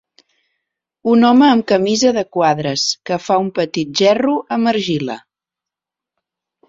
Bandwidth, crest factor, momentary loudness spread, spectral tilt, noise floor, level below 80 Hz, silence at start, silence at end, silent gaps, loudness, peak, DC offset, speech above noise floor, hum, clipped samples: 7.8 kHz; 16 dB; 10 LU; -4.5 dB/octave; -86 dBFS; -60 dBFS; 1.05 s; 1.5 s; none; -15 LUFS; -2 dBFS; under 0.1%; 71 dB; none; under 0.1%